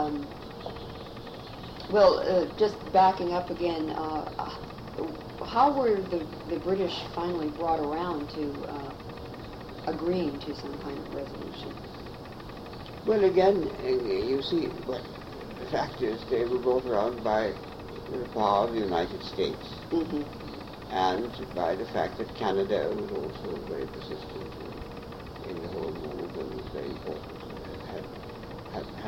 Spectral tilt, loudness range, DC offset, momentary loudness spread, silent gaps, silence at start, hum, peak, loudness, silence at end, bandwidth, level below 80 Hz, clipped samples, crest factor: -6.5 dB/octave; 11 LU; under 0.1%; 17 LU; none; 0 s; none; -10 dBFS; -30 LUFS; 0 s; 16 kHz; -50 dBFS; under 0.1%; 20 dB